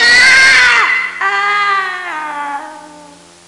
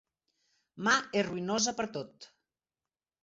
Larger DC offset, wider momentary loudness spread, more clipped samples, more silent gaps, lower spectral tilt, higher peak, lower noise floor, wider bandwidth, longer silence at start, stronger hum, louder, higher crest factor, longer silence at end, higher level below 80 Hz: neither; first, 17 LU vs 12 LU; neither; neither; second, 0.5 dB/octave vs -2.5 dB/octave; first, 0 dBFS vs -12 dBFS; second, -38 dBFS vs under -90 dBFS; first, 11.5 kHz vs 8 kHz; second, 0 s vs 0.75 s; neither; first, -8 LUFS vs -31 LUFS; second, 12 dB vs 22 dB; second, 0.45 s vs 0.95 s; first, -48 dBFS vs -72 dBFS